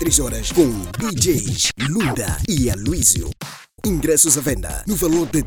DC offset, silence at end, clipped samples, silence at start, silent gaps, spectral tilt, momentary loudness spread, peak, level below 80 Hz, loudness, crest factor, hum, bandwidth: under 0.1%; 0 s; under 0.1%; 0 s; none; -3.5 dB/octave; 10 LU; 0 dBFS; -30 dBFS; -18 LUFS; 18 dB; none; over 20 kHz